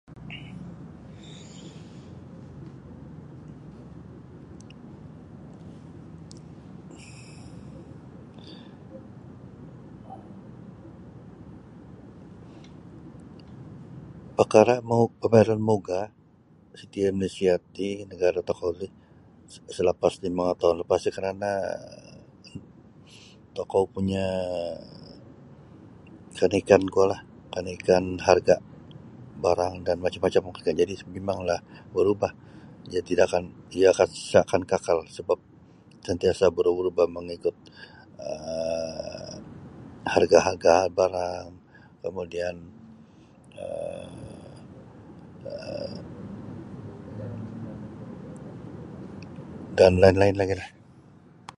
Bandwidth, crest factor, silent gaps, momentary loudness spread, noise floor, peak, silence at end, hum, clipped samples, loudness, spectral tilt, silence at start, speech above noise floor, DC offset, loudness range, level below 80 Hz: 11.5 kHz; 26 dB; none; 25 LU; -56 dBFS; -2 dBFS; 0.9 s; none; under 0.1%; -25 LUFS; -6 dB/octave; 0.1 s; 32 dB; under 0.1%; 21 LU; -52 dBFS